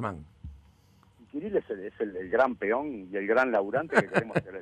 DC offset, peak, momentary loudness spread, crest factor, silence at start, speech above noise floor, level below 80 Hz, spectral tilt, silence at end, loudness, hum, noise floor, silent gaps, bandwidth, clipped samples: under 0.1%; -8 dBFS; 17 LU; 22 dB; 0 s; 32 dB; -58 dBFS; -7 dB/octave; 0 s; -28 LUFS; none; -61 dBFS; none; 11 kHz; under 0.1%